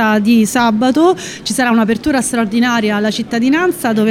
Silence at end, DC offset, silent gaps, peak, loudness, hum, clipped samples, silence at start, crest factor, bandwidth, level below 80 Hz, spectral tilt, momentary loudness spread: 0 s; under 0.1%; none; 0 dBFS; -13 LUFS; none; under 0.1%; 0 s; 12 dB; 16 kHz; -46 dBFS; -4.5 dB/octave; 5 LU